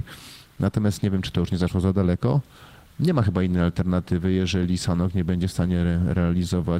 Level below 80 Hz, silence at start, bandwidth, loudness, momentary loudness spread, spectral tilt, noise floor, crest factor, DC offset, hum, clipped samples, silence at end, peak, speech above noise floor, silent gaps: -40 dBFS; 0 s; 12.5 kHz; -23 LUFS; 4 LU; -7 dB/octave; -44 dBFS; 14 dB; under 0.1%; none; under 0.1%; 0 s; -10 dBFS; 22 dB; none